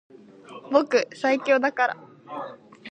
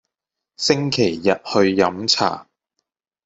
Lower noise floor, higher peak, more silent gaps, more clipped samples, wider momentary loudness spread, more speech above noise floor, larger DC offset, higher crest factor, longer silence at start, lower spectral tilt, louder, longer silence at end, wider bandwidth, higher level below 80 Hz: second, -45 dBFS vs -84 dBFS; about the same, -4 dBFS vs -2 dBFS; neither; neither; first, 22 LU vs 6 LU; second, 22 dB vs 66 dB; neither; about the same, 22 dB vs 18 dB; about the same, 0.5 s vs 0.6 s; about the same, -3.5 dB/octave vs -4 dB/octave; second, -23 LUFS vs -18 LUFS; second, 0 s vs 0.85 s; about the same, 9 kHz vs 8.2 kHz; second, -76 dBFS vs -60 dBFS